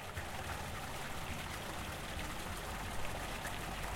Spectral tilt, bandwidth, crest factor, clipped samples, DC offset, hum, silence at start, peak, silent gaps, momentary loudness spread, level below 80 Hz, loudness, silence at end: -3.5 dB/octave; 16.5 kHz; 14 dB; under 0.1%; under 0.1%; none; 0 s; -26 dBFS; none; 1 LU; -50 dBFS; -43 LUFS; 0 s